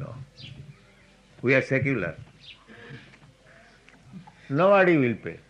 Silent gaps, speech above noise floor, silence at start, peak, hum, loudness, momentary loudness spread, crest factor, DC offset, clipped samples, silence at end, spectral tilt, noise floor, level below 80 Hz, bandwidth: none; 34 dB; 0 s; -6 dBFS; none; -23 LUFS; 28 LU; 20 dB; under 0.1%; under 0.1%; 0.15 s; -7.5 dB/octave; -56 dBFS; -60 dBFS; 9.4 kHz